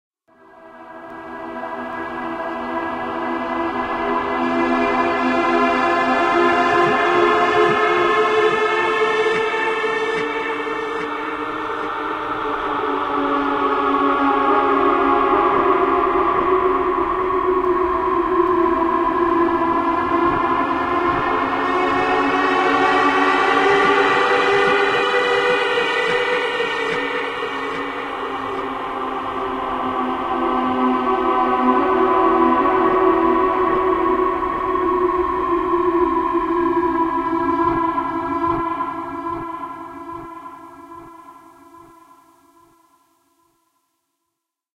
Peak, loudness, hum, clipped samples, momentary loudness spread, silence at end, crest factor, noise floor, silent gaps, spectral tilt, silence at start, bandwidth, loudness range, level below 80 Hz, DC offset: -4 dBFS; -18 LUFS; none; under 0.1%; 10 LU; 2.95 s; 16 dB; -79 dBFS; none; -5 dB/octave; 0.6 s; 10.5 kHz; 8 LU; -46 dBFS; under 0.1%